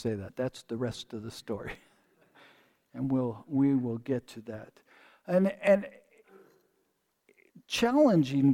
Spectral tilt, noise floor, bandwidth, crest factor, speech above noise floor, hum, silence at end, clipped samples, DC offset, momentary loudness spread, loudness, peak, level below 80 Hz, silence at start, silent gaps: -6.5 dB/octave; -76 dBFS; 16 kHz; 18 dB; 48 dB; none; 0 s; under 0.1%; under 0.1%; 20 LU; -29 LUFS; -12 dBFS; -64 dBFS; 0 s; none